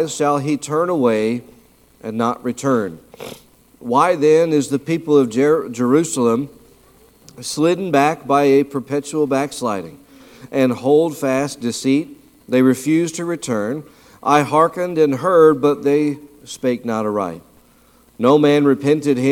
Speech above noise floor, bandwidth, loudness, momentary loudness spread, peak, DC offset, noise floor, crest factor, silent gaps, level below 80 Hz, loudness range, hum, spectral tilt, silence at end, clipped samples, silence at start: 35 dB; 16.5 kHz; -17 LUFS; 14 LU; 0 dBFS; under 0.1%; -52 dBFS; 16 dB; none; -60 dBFS; 3 LU; none; -5.5 dB/octave; 0 s; under 0.1%; 0 s